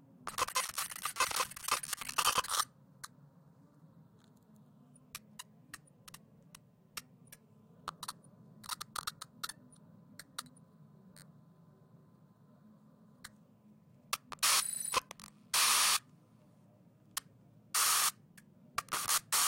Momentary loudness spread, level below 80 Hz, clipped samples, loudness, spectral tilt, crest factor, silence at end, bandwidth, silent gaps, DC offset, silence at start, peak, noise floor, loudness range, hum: 25 LU; -72 dBFS; under 0.1%; -33 LUFS; 1 dB/octave; 22 dB; 0 s; 17 kHz; none; under 0.1%; 0.25 s; -16 dBFS; -64 dBFS; 23 LU; none